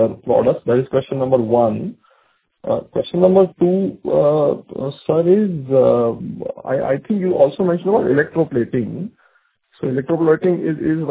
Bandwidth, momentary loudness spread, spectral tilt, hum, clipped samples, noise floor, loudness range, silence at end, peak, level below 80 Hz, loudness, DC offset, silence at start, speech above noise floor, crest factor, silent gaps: 4 kHz; 12 LU; -12 dB/octave; none; under 0.1%; -60 dBFS; 3 LU; 0 s; 0 dBFS; -52 dBFS; -17 LUFS; under 0.1%; 0 s; 44 dB; 16 dB; none